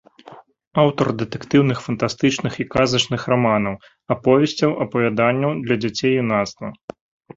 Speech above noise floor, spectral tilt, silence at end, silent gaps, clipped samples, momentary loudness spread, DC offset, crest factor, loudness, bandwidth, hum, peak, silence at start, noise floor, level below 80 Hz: 25 dB; -5.5 dB/octave; 0.6 s; 0.67-0.71 s; under 0.1%; 10 LU; under 0.1%; 18 dB; -19 LUFS; 7.8 kHz; none; -2 dBFS; 0.3 s; -44 dBFS; -52 dBFS